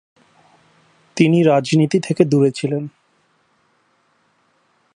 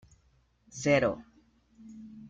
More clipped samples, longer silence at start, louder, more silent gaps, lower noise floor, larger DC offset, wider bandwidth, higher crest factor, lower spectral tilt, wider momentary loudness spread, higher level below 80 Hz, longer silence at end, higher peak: neither; first, 1.15 s vs 0.75 s; first, -16 LUFS vs -28 LUFS; neither; second, -62 dBFS vs -68 dBFS; neither; first, 11 kHz vs 9 kHz; about the same, 20 dB vs 22 dB; first, -7 dB/octave vs -5 dB/octave; second, 12 LU vs 23 LU; about the same, -66 dBFS vs -62 dBFS; first, 2.05 s vs 0 s; first, 0 dBFS vs -12 dBFS